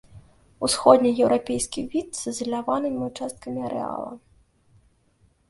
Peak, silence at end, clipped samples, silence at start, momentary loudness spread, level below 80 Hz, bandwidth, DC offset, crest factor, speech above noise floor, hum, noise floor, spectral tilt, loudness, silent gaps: 0 dBFS; 1.35 s; under 0.1%; 0.15 s; 15 LU; -56 dBFS; 12 kHz; under 0.1%; 24 dB; 39 dB; none; -63 dBFS; -4 dB/octave; -24 LUFS; none